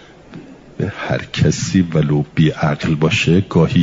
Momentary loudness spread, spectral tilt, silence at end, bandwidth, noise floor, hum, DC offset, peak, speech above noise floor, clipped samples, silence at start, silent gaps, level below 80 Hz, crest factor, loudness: 8 LU; -6 dB/octave; 0 s; 7.8 kHz; -37 dBFS; none; under 0.1%; -2 dBFS; 23 dB; under 0.1%; 0.3 s; none; -44 dBFS; 14 dB; -16 LUFS